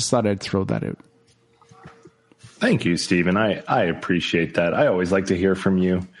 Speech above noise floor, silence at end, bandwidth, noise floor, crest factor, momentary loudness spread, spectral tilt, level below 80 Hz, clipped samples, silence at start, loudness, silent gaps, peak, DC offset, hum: 38 dB; 0.15 s; 11.5 kHz; -59 dBFS; 16 dB; 5 LU; -5.5 dB/octave; -54 dBFS; under 0.1%; 0 s; -21 LUFS; none; -6 dBFS; under 0.1%; none